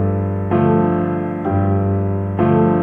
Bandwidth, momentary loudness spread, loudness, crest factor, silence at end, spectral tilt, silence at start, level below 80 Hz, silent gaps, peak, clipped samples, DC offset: 3.4 kHz; 6 LU; -17 LUFS; 14 dB; 0 s; -12 dB/octave; 0 s; -46 dBFS; none; -2 dBFS; under 0.1%; under 0.1%